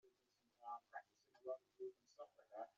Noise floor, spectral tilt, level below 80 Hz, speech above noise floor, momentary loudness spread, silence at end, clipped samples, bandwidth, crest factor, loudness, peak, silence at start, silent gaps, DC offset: -84 dBFS; -2 dB/octave; under -90 dBFS; 27 dB; 9 LU; 0.05 s; under 0.1%; 7.2 kHz; 20 dB; -57 LUFS; -38 dBFS; 0.05 s; none; under 0.1%